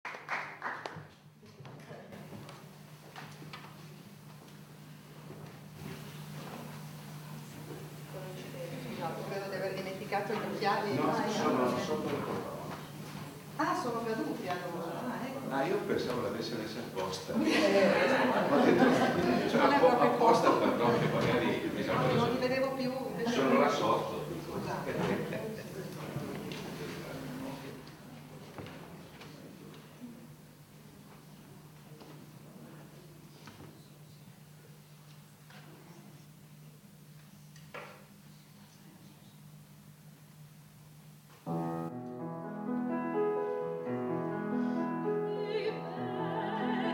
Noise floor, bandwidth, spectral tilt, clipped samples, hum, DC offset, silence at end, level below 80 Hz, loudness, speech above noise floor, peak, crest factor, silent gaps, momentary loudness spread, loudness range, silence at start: -56 dBFS; 18 kHz; -5.5 dB/octave; under 0.1%; none; under 0.1%; 0 s; -68 dBFS; -32 LUFS; 27 dB; -12 dBFS; 24 dB; none; 26 LU; 25 LU; 0.05 s